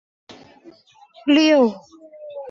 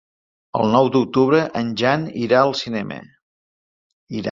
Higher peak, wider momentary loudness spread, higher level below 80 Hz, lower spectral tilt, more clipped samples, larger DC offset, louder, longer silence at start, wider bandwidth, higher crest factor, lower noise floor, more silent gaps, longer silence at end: second, -6 dBFS vs -2 dBFS; first, 25 LU vs 12 LU; second, -68 dBFS vs -58 dBFS; second, -4.5 dB/octave vs -6.5 dB/octave; neither; neither; about the same, -17 LUFS vs -19 LUFS; second, 0.3 s vs 0.55 s; about the same, 7.4 kHz vs 7.6 kHz; about the same, 16 dB vs 18 dB; second, -50 dBFS vs under -90 dBFS; second, none vs 3.22-4.07 s; about the same, 0 s vs 0 s